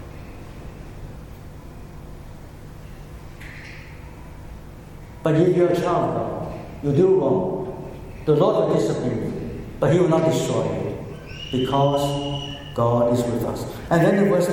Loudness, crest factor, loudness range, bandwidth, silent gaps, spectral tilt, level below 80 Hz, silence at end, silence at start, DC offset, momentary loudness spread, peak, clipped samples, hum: -21 LUFS; 16 dB; 18 LU; 17.5 kHz; none; -7 dB/octave; -42 dBFS; 0 s; 0 s; under 0.1%; 23 LU; -6 dBFS; under 0.1%; none